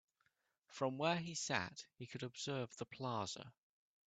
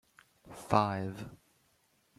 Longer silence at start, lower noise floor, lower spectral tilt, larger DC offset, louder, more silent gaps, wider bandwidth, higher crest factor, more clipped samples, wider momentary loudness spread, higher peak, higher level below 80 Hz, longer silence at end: first, 0.7 s vs 0.45 s; first, -83 dBFS vs -72 dBFS; second, -4 dB/octave vs -6.5 dB/octave; neither; second, -43 LUFS vs -32 LUFS; neither; second, 9 kHz vs 15 kHz; about the same, 26 dB vs 26 dB; neither; second, 13 LU vs 21 LU; second, -20 dBFS vs -10 dBFS; second, -82 dBFS vs -66 dBFS; second, 0.6 s vs 0.85 s